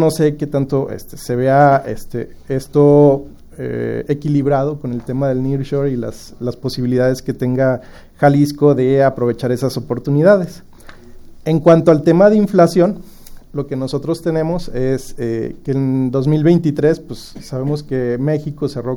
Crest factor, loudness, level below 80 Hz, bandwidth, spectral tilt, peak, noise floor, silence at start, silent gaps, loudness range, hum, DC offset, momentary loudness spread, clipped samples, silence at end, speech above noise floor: 16 dB; -16 LUFS; -40 dBFS; 17 kHz; -8 dB/octave; 0 dBFS; -36 dBFS; 0 s; none; 5 LU; none; under 0.1%; 14 LU; under 0.1%; 0 s; 21 dB